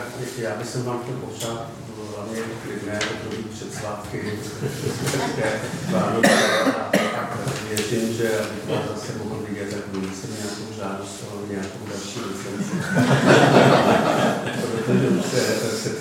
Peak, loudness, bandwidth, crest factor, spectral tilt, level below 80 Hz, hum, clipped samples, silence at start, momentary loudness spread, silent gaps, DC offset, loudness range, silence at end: 0 dBFS; -23 LUFS; 17.5 kHz; 22 dB; -5 dB/octave; -56 dBFS; none; under 0.1%; 0 s; 14 LU; none; under 0.1%; 11 LU; 0 s